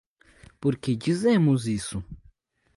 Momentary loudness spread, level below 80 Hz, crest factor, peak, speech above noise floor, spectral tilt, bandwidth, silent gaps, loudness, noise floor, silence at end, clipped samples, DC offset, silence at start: 14 LU; -52 dBFS; 16 dB; -12 dBFS; 37 dB; -6.5 dB/octave; 11.5 kHz; none; -25 LUFS; -61 dBFS; 0.6 s; under 0.1%; under 0.1%; 0.6 s